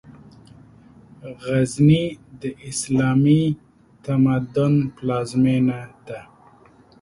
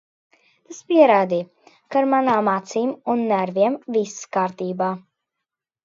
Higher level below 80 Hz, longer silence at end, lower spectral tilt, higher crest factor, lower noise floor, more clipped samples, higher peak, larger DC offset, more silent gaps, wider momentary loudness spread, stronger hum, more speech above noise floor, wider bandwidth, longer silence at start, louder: first, -52 dBFS vs -74 dBFS; about the same, 0.8 s vs 0.85 s; first, -7 dB/octave vs -5.5 dB/octave; about the same, 16 dB vs 20 dB; second, -51 dBFS vs -84 dBFS; neither; about the same, -4 dBFS vs -2 dBFS; neither; neither; first, 20 LU vs 11 LU; neither; second, 32 dB vs 64 dB; first, 11.5 kHz vs 7.8 kHz; second, 0.1 s vs 0.7 s; about the same, -20 LUFS vs -20 LUFS